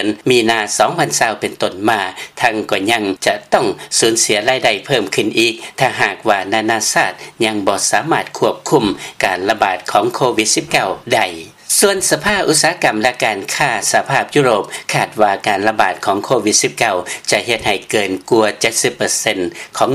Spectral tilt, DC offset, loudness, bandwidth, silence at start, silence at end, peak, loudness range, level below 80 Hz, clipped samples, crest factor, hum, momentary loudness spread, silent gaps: -2.5 dB/octave; under 0.1%; -15 LUFS; 16 kHz; 0 s; 0 s; 0 dBFS; 2 LU; -52 dBFS; under 0.1%; 16 dB; none; 5 LU; none